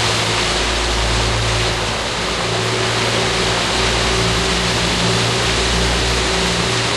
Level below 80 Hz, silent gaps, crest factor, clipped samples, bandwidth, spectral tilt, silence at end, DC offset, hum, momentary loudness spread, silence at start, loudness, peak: -26 dBFS; none; 14 dB; under 0.1%; 12.5 kHz; -3 dB/octave; 0 s; under 0.1%; none; 2 LU; 0 s; -16 LUFS; -4 dBFS